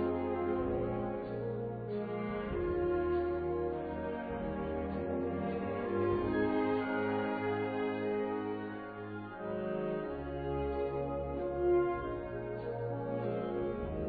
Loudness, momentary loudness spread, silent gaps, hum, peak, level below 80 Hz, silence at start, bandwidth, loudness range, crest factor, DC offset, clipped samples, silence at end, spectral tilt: -36 LUFS; 7 LU; none; none; -22 dBFS; -52 dBFS; 0 s; 4.8 kHz; 3 LU; 14 dB; under 0.1%; under 0.1%; 0 s; -7 dB/octave